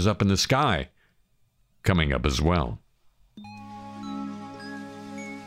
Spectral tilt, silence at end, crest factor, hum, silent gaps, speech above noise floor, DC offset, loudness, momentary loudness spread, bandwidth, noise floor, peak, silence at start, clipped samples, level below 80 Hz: -5 dB/octave; 0 s; 18 dB; none; none; 43 dB; under 0.1%; -25 LUFS; 20 LU; 16 kHz; -66 dBFS; -8 dBFS; 0 s; under 0.1%; -38 dBFS